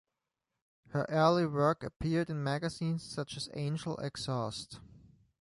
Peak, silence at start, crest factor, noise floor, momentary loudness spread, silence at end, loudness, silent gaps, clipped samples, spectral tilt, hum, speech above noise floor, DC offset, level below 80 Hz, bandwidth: -16 dBFS; 0.9 s; 20 dB; -88 dBFS; 12 LU; 0.45 s; -34 LUFS; 1.96-2.00 s; under 0.1%; -6 dB/octave; none; 55 dB; under 0.1%; -60 dBFS; 11.5 kHz